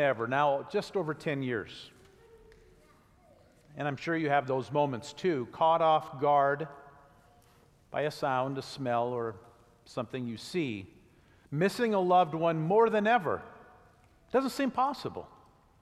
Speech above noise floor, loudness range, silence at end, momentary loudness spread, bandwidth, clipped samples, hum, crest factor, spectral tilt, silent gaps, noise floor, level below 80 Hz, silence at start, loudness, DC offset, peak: 33 dB; 7 LU; 0.55 s; 14 LU; 14.5 kHz; under 0.1%; none; 18 dB; -6 dB/octave; none; -62 dBFS; -68 dBFS; 0 s; -30 LUFS; under 0.1%; -14 dBFS